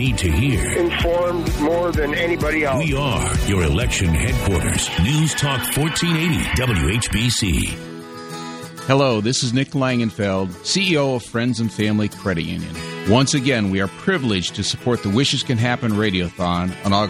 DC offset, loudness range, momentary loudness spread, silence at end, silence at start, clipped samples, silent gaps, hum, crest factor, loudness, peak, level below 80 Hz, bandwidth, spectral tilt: under 0.1%; 2 LU; 5 LU; 0 s; 0 s; under 0.1%; none; none; 18 dB; -19 LUFS; 0 dBFS; -30 dBFS; 15.5 kHz; -4.5 dB/octave